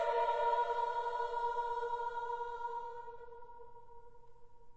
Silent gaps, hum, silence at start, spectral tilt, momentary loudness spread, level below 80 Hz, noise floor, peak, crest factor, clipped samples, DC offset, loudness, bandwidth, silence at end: none; none; 0 s; 0.5 dB/octave; 21 LU; -64 dBFS; -59 dBFS; -22 dBFS; 16 dB; under 0.1%; 0.2%; -37 LUFS; 8 kHz; 0 s